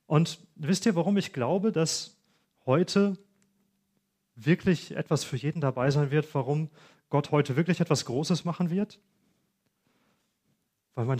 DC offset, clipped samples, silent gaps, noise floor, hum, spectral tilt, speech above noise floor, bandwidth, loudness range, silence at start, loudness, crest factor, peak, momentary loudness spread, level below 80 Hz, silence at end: under 0.1%; under 0.1%; none; -76 dBFS; none; -6 dB/octave; 49 dB; 15 kHz; 2 LU; 0.1 s; -28 LUFS; 20 dB; -8 dBFS; 8 LU; -66 dBFS; 0 s